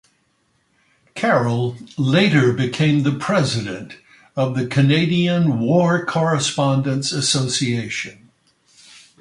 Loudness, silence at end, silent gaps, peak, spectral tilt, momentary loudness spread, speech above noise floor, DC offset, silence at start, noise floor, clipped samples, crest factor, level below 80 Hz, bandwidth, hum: -18 LUFS; 1.1 s; none; -2 dBFS; -5 dB/octave; 10 LU; 46 dB; under 0.1%; 1.15 s; -64 dBFS; under 0.1%; 16 dB; -56 dBFS; 11.5 kHz; none